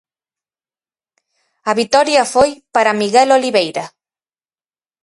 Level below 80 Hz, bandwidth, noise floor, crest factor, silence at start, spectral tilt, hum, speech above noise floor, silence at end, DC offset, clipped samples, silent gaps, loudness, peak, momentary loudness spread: -56 dBFS; 11.5 kHz; under -90 dBFS; 16 dB; 1.65 s; -3 dB/octave; none; over 77 dB; 1.15 s; under 0.1%; under 0.1%; none; -14 LUFS; 0 dBFS; 12 LU